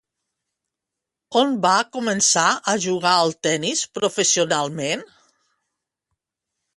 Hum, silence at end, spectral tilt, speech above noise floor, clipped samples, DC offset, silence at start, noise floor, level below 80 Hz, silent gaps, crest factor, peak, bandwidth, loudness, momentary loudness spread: none; 1.7 s; -2 dB/octave; 65 dB; under 0.1%; under 0.1%; 1.3 s; -85 dBFS; -68 dBFS; none; 20 dB; -4 dBFS; 11.5 kHz; -19 LUFS; 7 LU